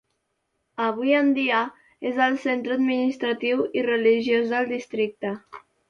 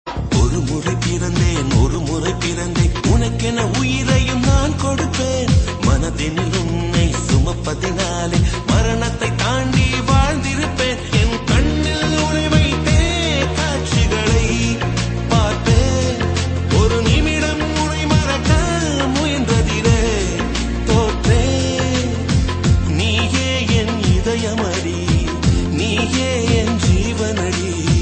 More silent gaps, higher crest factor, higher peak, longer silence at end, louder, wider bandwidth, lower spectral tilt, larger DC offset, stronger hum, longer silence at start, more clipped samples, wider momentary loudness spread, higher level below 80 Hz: neither; about the same, 16 dB vs 16 dB; second, -8 dBFS vs 0 dBFS; first, 0.3 s vs 0 s; second, -23 LUFS vs -17 LUFS; second, 7 kHz vs 8.8 kHz; about the same, -5.5 dB/octave vs -5 dB/octave; neither; neither; first, 0.8 s vs 0.05 s; neither; first, 12 LU vs 4 LU; second, -70 dBFS vs -22 dBFS